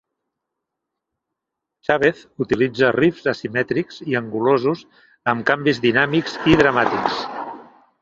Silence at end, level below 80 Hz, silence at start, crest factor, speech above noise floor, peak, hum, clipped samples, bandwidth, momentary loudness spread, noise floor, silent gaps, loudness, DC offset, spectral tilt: 0.4 s; -50 dBFS; 1.9 s; 20 dB; 64 dB; 0 dBFS; none; under 0.1%; 7.6 kHz; 10 LU; -83 dBFS; none; -19 LUFS; under 0.1%; -6.5 dB/octave